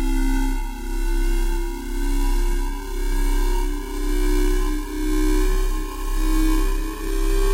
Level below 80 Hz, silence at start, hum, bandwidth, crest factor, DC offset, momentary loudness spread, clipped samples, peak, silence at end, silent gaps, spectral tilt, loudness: -20 dBFS; 0 s; none; 16 kHz; 10 dB; under 0.1%; 7 LU; under 0.1%; -10 dBFS; 0 s; none; -5 dB/octave; -25 LUFS